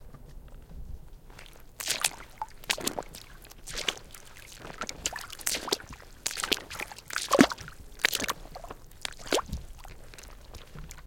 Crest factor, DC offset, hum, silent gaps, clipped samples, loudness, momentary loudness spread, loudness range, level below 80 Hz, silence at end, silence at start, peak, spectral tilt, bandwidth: 34 dB; under 0.1%; none; none; under 0.1%; -31 LUFS; 22 LU; 6 LU; -48 dBFS; 0 s; 0 s; 0 dBFS; -2 dB/octave; 17 kHz